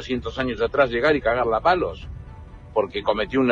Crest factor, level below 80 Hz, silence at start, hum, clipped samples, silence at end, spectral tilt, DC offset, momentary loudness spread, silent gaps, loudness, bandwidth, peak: 18 dB; -40 dBFS; 0 s; none; under 0.1%; 0 s; -6.5 dB/octave; under 0.1%; 18 LU; none; -22 LUFS; 7.6 kHz; -6 dBFS